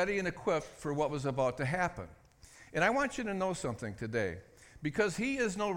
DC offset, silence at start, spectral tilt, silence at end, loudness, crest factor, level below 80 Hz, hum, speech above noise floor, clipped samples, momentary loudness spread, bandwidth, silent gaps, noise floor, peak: under 0.1%; 0 s; -5.5 dB/octave; 0 s; -34 LUFS; 20 dB; -58 dBFS; none; 24 dB; under 0.1%; 9 LU; 16.5 kHz; none; -58 dBFS; -14 dBFS